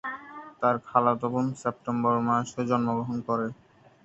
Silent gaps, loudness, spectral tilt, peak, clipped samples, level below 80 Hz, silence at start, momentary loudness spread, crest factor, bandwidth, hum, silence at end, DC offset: none; -27 LUFS; -7 dB/octave; -6 dBFS; under 0.1%; -66 dBFS; 0.05 s; 10 LU; 22 dB; 8.2 kHz; none; 0.5 s; under 0.1%